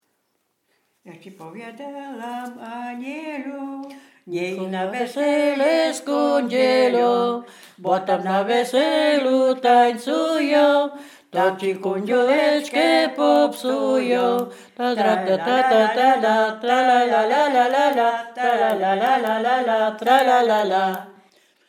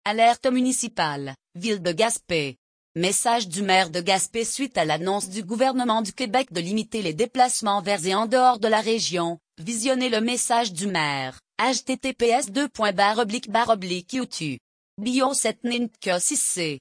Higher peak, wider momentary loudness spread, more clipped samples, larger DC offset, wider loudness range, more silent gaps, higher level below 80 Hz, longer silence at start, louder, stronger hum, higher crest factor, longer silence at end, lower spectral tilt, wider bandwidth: first, -2 dBFS vs -6 dBFS; first, 15 LU vs 9 LU; neither; neither; first, 12 LU vs 2 LU; second, none vs 2.58-2.95 s, 14.60-14.97 s; second, -88 dBFS vs -64 dBFS; first, 1.05 s vs 0.05 s; first, -19 LUFS vs -23 LUFS; neither; about the same, 18 dB vs 18 dB; first, 0.55 s vs 0 s; first, -4.5 dB/octave vs -3 dB/octave; first, 17 kHz vs 10.5 kHz